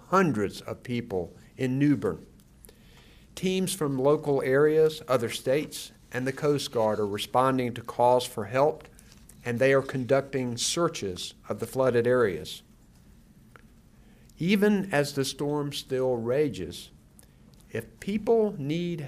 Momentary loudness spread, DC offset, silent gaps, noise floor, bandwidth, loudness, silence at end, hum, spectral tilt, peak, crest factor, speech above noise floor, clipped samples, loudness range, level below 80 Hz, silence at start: 14 LU; under 0.1%; none; -55 dBFS; 15.5 kHz; -27 LUFS; 0 s; none; -5 dB/octave; -10 dBFS; 18 dB; 29 dB; under 0.1%; 4 LU; -58 dBFS; 0.1 s